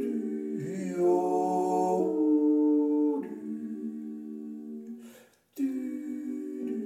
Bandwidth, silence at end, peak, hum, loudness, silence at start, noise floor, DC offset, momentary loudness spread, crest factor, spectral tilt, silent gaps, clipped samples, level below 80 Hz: 14 kHz; 0 s; -16 dBFS; none; -29 LUFS; 0 s; -55 dBFS; under 0.1%; 16 LU; 14 dB; -8 dB/octave; none; under 0.1%; -78 dBFS